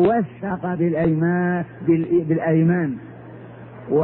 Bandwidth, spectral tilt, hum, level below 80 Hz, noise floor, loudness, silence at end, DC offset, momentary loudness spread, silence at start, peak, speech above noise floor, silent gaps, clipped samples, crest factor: 4 kHz; -13 dB/octave; none; -54 dBFS; -39 dBFS; -21 LUFS; 0 s; under 0.1%; 21 LU; 0 s; -6 dBFS; 19 dB; none; under 0.1%; 14 dB